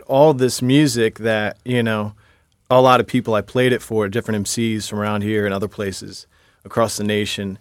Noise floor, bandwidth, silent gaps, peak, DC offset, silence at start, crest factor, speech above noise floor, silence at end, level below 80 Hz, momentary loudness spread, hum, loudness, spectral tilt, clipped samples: -37 dBFS; 17 kHz; none; 0 dBFS; under 0.1%; 0.1 s; 18 dB; 19 dB; 0.05 s; -54 dBFS; 11 LU; none; -18 LUFS; -5 dB/octave; under 0.1%